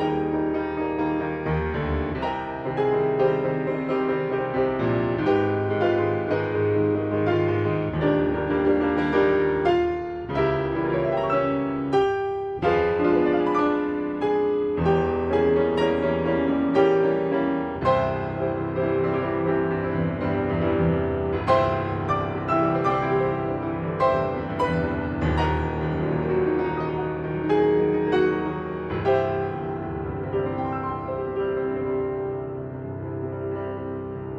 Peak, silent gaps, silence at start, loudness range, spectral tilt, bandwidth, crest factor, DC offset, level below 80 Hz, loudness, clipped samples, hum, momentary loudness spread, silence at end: -6 dBFS; none; 0 s; 4 LU; -8.5 dB/octave; 6.4 kHz; 18 dB; under 0.1%; -42 dBFS; -24 LUFS; under 0.1%; none; 8 LU; 0 s